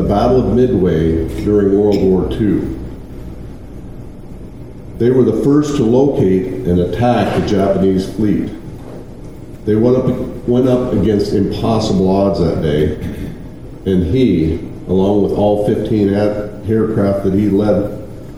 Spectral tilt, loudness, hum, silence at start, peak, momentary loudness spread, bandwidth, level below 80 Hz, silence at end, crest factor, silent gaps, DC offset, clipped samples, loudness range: -8 dB/octave; -14 LUFS; none; 0 s; 0 dBFS; 20 LU; 13.5 kHz; -32 dBFS; 0 s; 14 dB; none; 2%; under 0.1%; 3 LU